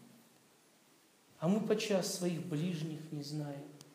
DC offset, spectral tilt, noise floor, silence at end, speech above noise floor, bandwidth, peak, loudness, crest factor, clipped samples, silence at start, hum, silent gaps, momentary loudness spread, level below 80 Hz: under 0.1%; -5.5 dB/octave; -67 dBFS; 0.05 s; 31 dB; 15.5 kHz; -20 dBFS; -37 LUFS; 18 dB; under 0.1%; 0 s; none; none; 10 LU; under -90 dBFS